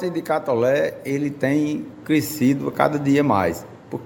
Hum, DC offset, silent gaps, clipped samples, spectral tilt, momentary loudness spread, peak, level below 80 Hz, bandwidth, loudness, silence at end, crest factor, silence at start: none; under 0.1%; none; under 0.1%; -6.5 dB/octave; 7 LU; 0 dBFS; -58 dBFS; 17 kHz; -21 LUFS; 0 s; 20 dB; 0 s